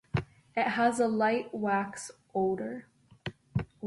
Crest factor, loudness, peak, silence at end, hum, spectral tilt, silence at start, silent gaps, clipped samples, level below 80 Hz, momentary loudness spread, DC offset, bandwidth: 16 dB; -31 LUFS; -14 dBFS; 0 s; none; -6 dB/octave; 0.15 s; none; under 0.1%; -56 dBFS; 16 LU; under 0.1%; 11.5 kHz